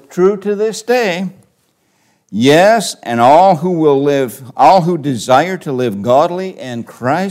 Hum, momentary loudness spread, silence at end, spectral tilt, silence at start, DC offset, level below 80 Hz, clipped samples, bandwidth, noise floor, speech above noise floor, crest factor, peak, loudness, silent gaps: none; 13 LU; 0 s; -5.5 dB/octave; 0.1 s; under 0.1%; -60 dBFS; under 0.1%; 16 kHz; -59 dBFS; 47 dB; 12 dB; 0 dBFS; -12 LUFS; none